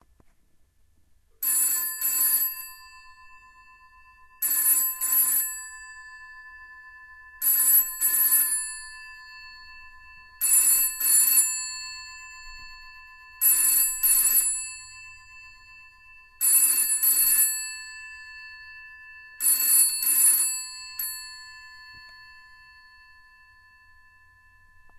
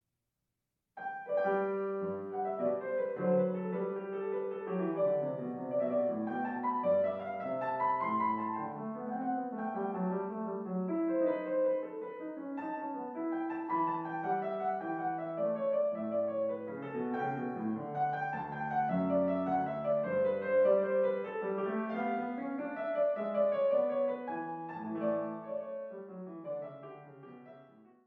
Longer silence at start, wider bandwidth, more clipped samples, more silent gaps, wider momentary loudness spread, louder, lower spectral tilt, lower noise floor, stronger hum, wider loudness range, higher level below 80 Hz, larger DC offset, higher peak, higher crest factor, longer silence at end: first, 1.4 s vs 0.95 s; first, 16 kHz vs 4.3 kHz; neither; neither; first, 25 LU vs 10 LU; first, -20 LUFS vs -34 LUFS; second, 3.5 dB/octave vs -10 dB/octave; second, -61 dBFS vs -86 dBFS; neither; about the same, 4 LU vs 4 LU; first, -58 dBFS vs -80 dBFS; neither; first, -8 dBFS vs -18 dBFS; about the same, 20 dB vs 16 dB; first, 2.75 s vs 0.25 s